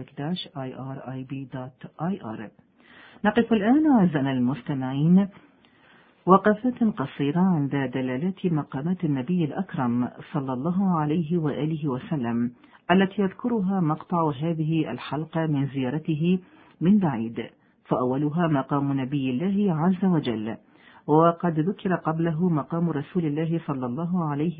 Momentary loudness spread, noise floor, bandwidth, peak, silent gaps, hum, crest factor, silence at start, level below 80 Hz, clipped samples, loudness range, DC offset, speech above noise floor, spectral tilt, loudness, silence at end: 12 LU; -56 dBFS; 4.8 kHz; -2 dBFS; none; none; 24 dB; 0 s; -60 dBFS; under 0.1%; 3 LU; under 0.1%; 32 dB; -12 dB/octave; -25 LUFS; 0 s